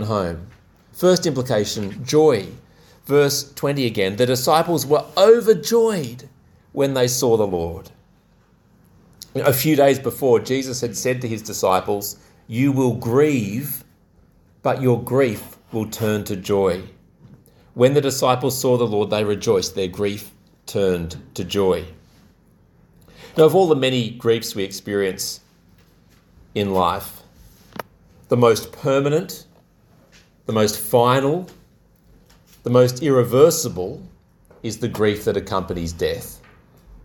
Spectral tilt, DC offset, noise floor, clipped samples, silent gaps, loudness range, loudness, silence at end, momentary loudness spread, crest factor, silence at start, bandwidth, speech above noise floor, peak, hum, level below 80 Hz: -5 dB/octave; under 0.1%; -56 dBFS; under 0.1%; none; 6 LU; -19 LUFS; 0.05 s; 15 LU; 20 dB; 0 s; 19 kHz; 37 dB; 0 dBFS; none; -50 dBFS